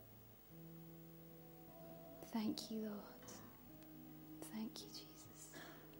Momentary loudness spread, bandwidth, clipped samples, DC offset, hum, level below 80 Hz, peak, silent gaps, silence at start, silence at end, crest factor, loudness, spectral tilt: 14 LU; 16.5 kHz; under 0.1%; under 0.1%; none; -76 dBFS; -26 dBFS; none; 0 s; 0 s; 26 dB; -52 LUFS; -4.5 dB/octave